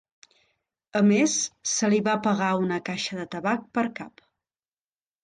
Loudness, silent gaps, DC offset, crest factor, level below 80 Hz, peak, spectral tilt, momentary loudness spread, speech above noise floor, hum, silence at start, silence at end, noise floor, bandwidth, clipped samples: -25 LUFS; none; under 0.1%; 16 dB; -68 dBFS; -12 dBFS; -4 dB/octave; 10 LU; over 65 dB; none; 0.95 s; 1.15 s; under -90 dBFS; 10 kHz; under 0.1%